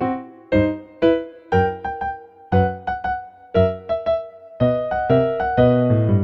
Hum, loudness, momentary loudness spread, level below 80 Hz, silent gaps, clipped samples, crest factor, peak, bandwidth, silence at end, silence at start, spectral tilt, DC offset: none; -20 LUFS; 10 LU; -42 dBFS; none; under 0.1%; 18 dB; -2 dBFS; 6 kHz; 0 s; 0 s; -9.5 dB/octave; under 0.1%